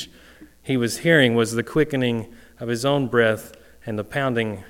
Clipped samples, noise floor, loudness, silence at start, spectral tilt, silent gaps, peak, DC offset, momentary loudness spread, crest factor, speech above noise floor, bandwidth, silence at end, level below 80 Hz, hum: under 0.1%; -48 dBFS; -21 LUFS; 0 s; -5 dB/octave; none; 0 dBFS; under 0.1%; 18 LU; 22 dB; 27 dB; 17 kHz; 0 s; -52 dBFS; none